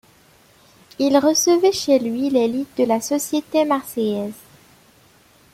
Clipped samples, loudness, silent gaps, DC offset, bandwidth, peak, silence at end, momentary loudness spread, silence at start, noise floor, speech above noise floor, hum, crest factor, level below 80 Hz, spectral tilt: under 0.1%; -19 LUFS; none; under 0.1%; 16.5 kHz; -2 dBFS; 1.2 s; 8 LU; 1 s; -53 dBFS; 35 dB; none; 18 dB; -62 dBFS; -3.5 dB/octave